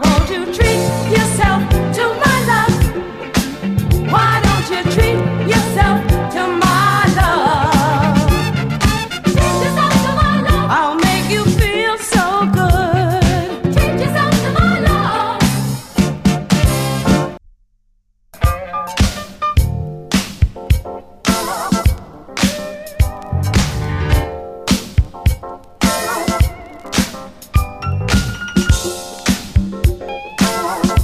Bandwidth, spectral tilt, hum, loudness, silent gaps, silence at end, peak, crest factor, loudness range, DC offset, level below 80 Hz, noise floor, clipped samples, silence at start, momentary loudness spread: 15.5 kHz; -5 dB/octave; none; -15 LUFS; none; 0 s; 0 dBFS; 14 dB; 5 LU; under 0.1%; -22 dBFS; -58 dBFS; under 0.1%; 0 s; 7 LU